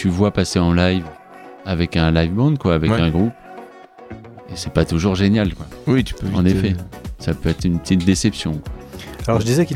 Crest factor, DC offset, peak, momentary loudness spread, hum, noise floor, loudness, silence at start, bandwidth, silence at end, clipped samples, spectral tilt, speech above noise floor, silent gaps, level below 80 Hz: 16 dB; under 0.1%; -2 dBFS; 18 LU; none; -40 dBFS; -19 LUFS; 0 s; 15 kHz; 0 s; under 0.1%; -6.5 dB/octave; 23 dB; none; -34 dBFS